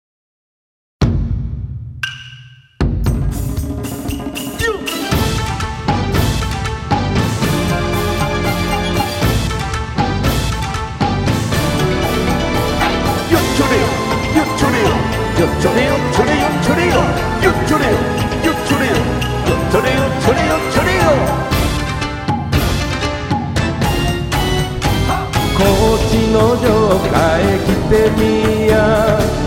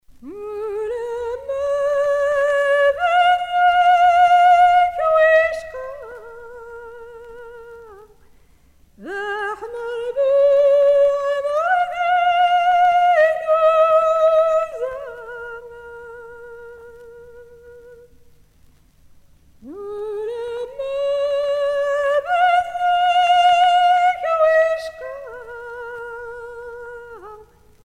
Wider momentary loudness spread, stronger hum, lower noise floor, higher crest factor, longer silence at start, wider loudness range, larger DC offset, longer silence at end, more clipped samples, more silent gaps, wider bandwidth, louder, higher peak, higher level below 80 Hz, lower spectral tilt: second, 7 LU vs 23 LU; neither; second, -39 dBFS vs -52 dBFS; about the same, 14 dB vs 14 dB; first, 1 s vs 0.25 s; second, 6 LU vs 18 LU; neither; second, 0 s vs 0.5 s; neither; neither; first, over 20 kHz vs 10 kHz; about the same, -15 LUFS vs -17 LUFS; first, 0 dBFS vs -4 dBFS; first, -24 dBFS vs -54 dBFS; first, -5.5 dB/octave vs -2 dB/octave